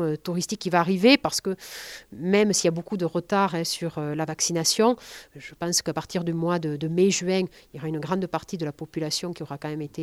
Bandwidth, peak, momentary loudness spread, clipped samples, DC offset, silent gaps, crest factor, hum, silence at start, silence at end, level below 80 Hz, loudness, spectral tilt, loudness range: 16 kHz; -6 dBFS; 13 LU; under 0.1%; under 0.1%; none; 20 dB; none; 0 s; 0 s; -60 dBFS; -25 LUFS; -4 dB/octave; 3 LU